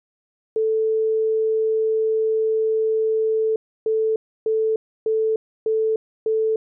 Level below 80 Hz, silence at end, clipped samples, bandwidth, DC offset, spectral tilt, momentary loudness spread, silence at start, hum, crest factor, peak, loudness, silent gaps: -74 dBFS; 0.2 s; under 0.1%; 0.9 kHz; under 0.1%; 0.5 dB/octave; 5 LU; 0.55 s; none; 4 dB; -16 dBFS; -22 LUFS; 3.56-3.86 s, 4.16-4.46 s, 4.76-5.06 s, 5.36-5.66 s, 5.96-6.26 s